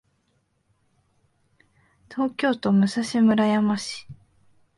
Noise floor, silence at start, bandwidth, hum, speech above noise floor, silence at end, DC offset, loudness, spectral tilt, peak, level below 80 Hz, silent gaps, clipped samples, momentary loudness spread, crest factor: -69 dBFS; 2.1 s; 11.5 kHz; none; 48 dB; 0.65 s; under 0.1%; -22 LUFS; -6 dB/octave; -8 dBFS; -64 dBFS; none; under 0.1%; 14 LU; 16 dB